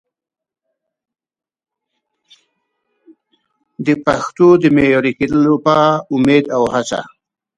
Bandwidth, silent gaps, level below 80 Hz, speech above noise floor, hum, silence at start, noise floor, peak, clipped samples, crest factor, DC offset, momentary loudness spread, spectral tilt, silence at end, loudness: 10.5 kHz; none; -50 dBFS; 62 dB; none; 3.8 s; -75 dBFS; 0 dBFS; under 0.1%; 16 dB; under 0.1%; 8 LU; -6.5 dB/octave; 0.5 s; -14 LUFS